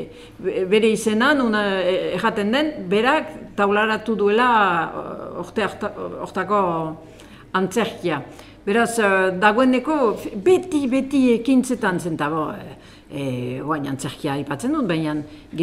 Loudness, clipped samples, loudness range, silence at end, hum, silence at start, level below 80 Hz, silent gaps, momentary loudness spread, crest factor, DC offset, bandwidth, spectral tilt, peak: -20 LUFS; under 0.1%; 6 LU; 0 s; none; 0 s; -52 dBFS; none; 12 LU; 18 dB; under 0.1%; 15.5 kHz; -5 dB/octave; -2 dBFS